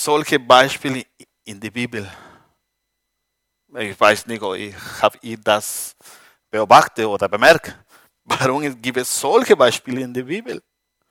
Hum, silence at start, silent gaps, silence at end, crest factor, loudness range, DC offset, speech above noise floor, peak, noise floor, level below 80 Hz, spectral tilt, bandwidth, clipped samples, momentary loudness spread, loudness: none; 0 s; none; 0.5 s; 20 dB; 7 LU; under 0.1%; 58 dB; 0 dBFS; -76 dBFS; -60 dBFS; -3 dB/octave; 17 kHz; under 0.1%; 18 LU; -17 LUFS